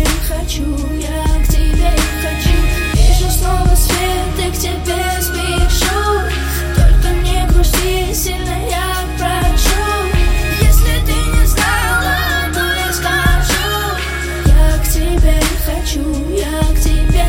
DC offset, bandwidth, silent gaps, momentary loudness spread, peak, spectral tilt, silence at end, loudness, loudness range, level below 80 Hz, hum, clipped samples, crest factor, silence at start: under 0.1%; 17 kHz; none; 5 LU; 0 dBFS; -4 dB/octave; 0 s; -15 LUFS; 2 LU; -14 dBFS; none; under 0.1%; 12 dB; 0 s